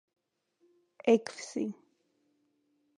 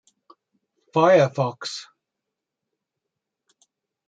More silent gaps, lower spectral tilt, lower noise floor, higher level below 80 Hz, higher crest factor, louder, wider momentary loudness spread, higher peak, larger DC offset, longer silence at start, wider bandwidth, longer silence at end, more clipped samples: neither; about the same, -5 dB/octave vs -5.5 dB/octave; second, -75 dBFS vs -84 dBFS; second, -86 dBFS vs -74 dBFS; about the same, 24 dB vs 22 dB; second, -31 LUFS vs -21 LUFS; second, 12 LU vs 16 LU; second, -12 dBFS vs -4 dBFS; neither; about the same, 1.05 s vs 0.95 s; first, 10.5 kHz vs 9 kHz; second, 1.25 s vs 2.25 s; neither